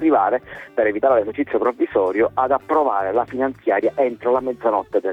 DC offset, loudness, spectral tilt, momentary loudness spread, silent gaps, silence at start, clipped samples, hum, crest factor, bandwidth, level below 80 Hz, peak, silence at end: under 0.1%; -20 LUFS; -8 dB/octave; 4 LU; none; 0 s; under 0.1%; none; 14 dB; 5.4 kHz; -56 dBFS; -4 dBFS; 0 s